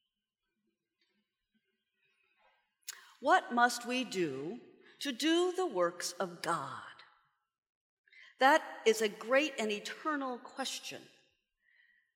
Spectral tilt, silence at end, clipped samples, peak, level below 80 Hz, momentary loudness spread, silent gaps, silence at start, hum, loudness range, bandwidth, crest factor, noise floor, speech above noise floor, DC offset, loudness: -3 dB/octave; 1.1 s; under 0.1%; -12 dBFS; under -90 dBFS; 19 LU; 7.58-7.63 s, 7.69-8.04 s; 2.9 s; none; 4 LU; 16.5 kHz; 24 dB; -89 dBFS; 56 dB; under 0.1%; -33 LUFS